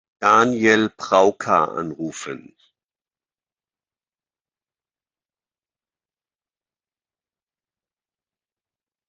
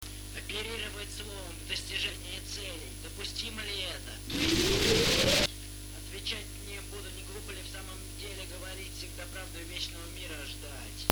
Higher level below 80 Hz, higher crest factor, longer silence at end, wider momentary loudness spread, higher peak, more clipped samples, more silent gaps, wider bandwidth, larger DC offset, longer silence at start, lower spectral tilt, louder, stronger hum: second, -68 dBFS vs -44 dBFS; second, 24 dB vs 34 dB; first, 6.7 s vs 0 s; about the same, 16 LU vs 16 LU; about the same, -2 dBFS vs 0 dBFS; neither; neither; second, 9.6 kHz vs over 20 kHz; neither; first, 0.2 s vs 0 s; first, -4.5 dB/octave vs -3 dB/octave; first, -18 LUFS vs -34 LUFS; second, none vs 50 Hz at -50 dBFS